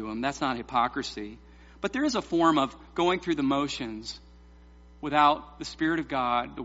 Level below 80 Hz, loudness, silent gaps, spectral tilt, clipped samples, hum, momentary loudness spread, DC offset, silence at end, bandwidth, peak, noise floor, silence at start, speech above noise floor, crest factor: -52 dBFS; -27 LUFS; none; -3 dB/octave; under 0.1%; none; 16 LU; under 0.1%; 0 s; 8 kHz; -8 dBFS; -52 dBFS; 0 s; 24 dB; 20 dB